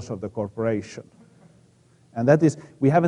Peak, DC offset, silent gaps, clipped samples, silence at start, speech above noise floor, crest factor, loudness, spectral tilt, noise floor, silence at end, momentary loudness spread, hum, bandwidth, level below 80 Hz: -2 dBFS; under 0.1%; none; under 0.1%; 0 s; 35 dB; 20 dB; -23 LUFS; -8 dB/octave; -57 dBFS; 0 s; 19 LU; none; 10.5 kHz; -60 dBFS